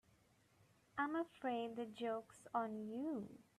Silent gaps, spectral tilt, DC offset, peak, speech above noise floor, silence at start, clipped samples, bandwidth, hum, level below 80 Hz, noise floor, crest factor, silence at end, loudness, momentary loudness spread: none; -5.5 dB/octave; under 0.1%; -28 dBFS; 29 dB; 0.95 s; under 0.1%; 13.5 kHz; none; -84 dBFS; -74 dBFS; 18 dB; 0.2 s; -45 LUFS; 6 LU